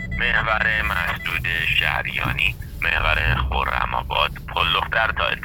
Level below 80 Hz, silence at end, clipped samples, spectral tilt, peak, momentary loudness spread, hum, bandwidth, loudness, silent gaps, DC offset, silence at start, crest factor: -30 dBFS; 0 s; under 0.1%; -4.5 dB/octave; -4 dBFS; 4 LU; none; over 20 kHz; -20 LUFS; none; under 0.1%; 0 s; 18 dB